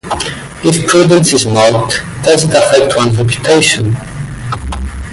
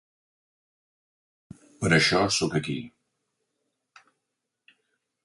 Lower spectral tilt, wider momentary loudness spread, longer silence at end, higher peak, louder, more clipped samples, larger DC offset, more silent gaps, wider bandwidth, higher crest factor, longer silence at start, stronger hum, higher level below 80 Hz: about the same, -4.5 dB/octave vs -4 dB/octave; about the same, 13 LU vs 15 LU; second, 0 s vs 2.35 s; first, 0 dBFS vs -8 dBFS; first, -10 LUFS vs -24 LUFS; neither; neither; neither; about the same, 12 kHz vs 11.5 kHz; second, 10 dB vs 24 dB; second, 0.05 s vs 1.8 s; neither; first, -30 dBFS vs -58 dBFS